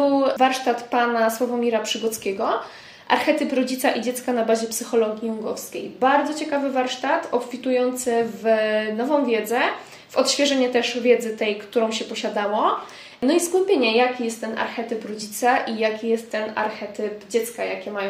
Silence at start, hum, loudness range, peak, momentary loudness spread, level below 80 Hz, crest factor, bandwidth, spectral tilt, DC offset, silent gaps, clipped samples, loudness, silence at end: 0 s; none; 2 LU; -4 dBFS; 9 LU; -70 dBFS; 18 dB; 16 kHz; -3 dB/octave; under 0.1%; none; under 0.1%; -22 LUFS; 0 s